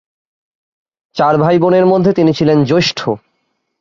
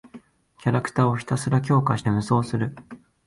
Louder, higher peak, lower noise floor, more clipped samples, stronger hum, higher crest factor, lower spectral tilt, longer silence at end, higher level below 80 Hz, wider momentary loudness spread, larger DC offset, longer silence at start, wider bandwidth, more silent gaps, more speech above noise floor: first, -12 LUFS vs -23 LUFS; first, -2 dBFS vs -6 dBFS; first, -67 dBFS vs -48 dBFS; neither; neither; second, 12 dB vs 18 dB; about the same, -6.5 dB/octave vs -7 dB/octave; first, 0.65 s vs 0.3 s; about the same, -52 dBFS vs -54 dBFS; about the same, 10 LU vs 8 LU; neither; first, 1.15 s vs 0.05 s; second, 7.4 kHz vs 11.5 kHz; neither; first, 56 dB vs 26 dB